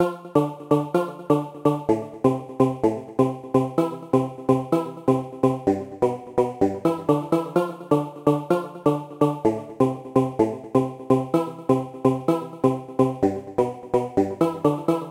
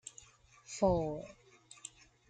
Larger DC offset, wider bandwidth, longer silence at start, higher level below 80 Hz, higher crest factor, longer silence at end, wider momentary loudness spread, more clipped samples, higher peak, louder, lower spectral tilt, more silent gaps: neither; first, 16 kHz vs 9.4 kHz; about the same, 0 s vs 0.05 s; about the same, -58 dBFS vs -56 dBFS; about the same, 18 dB vs 22 dB; second, 0 s vs 0.4 s; second, 4 LU vs 23 LU; neither; first, -4 dBFS vs -16 dBFS; first, -23 LUFS vs -35 LUFS; first, -8.5 dB/octave vs -6 dB/octave; neither